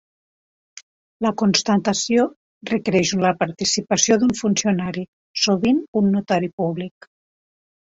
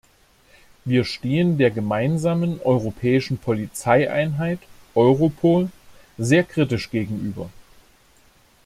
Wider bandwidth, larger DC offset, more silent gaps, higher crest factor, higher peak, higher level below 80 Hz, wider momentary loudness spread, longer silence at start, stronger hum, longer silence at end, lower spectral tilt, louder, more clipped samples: second, 8 kHz vs 15 kHz; neither; first, 0.83-1.20 s, 2.36-2.61 s, 5.08-5.34 s, 5.88-5.93 s, 6.53-6.58 s vs none; about the same, 20 dB vs 18 dB; first, 0 dBFS vs -4 dBFS; second, -58 dBFS vs -52 dBFS; about the same, 9 LU vs 11 LU; about the same, 0.75 s vs 0.85 s; neither; about the same, 1.05 s vs 1.05 s; second, -4 dB/octave vs -7 dB/octave; about the same, -20 LUFS vs -21 LUFS; neither